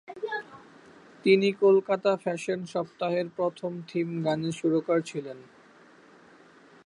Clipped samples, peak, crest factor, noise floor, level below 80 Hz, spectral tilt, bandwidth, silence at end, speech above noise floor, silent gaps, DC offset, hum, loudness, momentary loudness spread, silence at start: under 0.1%; -8 dBFS; 20 dB; -55 dBFS; -76 dBFS; -6 dB/octave; 11 kHz; 1.45 s; 29 dB; none; under 0.1%; none; -27 LUFS; 14 LU; 0.1 s